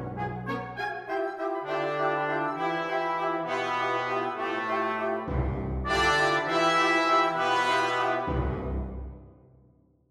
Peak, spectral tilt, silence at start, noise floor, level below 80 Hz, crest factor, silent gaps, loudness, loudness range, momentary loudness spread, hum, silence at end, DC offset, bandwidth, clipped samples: -12 dBFS; -5 dB/octave; 0 s; -61 dBFS; -42 dBFS; 16 dB; none; -27 LUFS; 5 LU; 11 LU; none; 0.8 s; under 0.1%; 14 kHz; under 0.1%